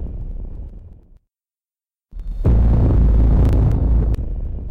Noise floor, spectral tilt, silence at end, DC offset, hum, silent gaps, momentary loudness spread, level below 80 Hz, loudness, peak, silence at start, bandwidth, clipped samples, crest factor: under -90 dBFS; -10.5 dB/octave; 0 s; under 0.1%; none; none; 19 LU; -18 dBFS; -17 LUFS; -8 dBFS; 0 s; 2.9 kHz; under 0.1%; 8 dB